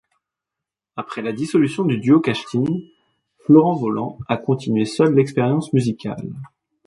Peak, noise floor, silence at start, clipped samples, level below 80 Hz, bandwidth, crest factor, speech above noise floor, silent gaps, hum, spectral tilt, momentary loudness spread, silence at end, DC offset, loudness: -2 dBFS; -86 dBFS; 0.95 s; under 0.1%; -58 dBFS; 11.5 kHz; 18 dB; 67 dB; none; none; -7.5 dB/octave; 16 LU; 0.4 s; under 0.1%; -19 LUFS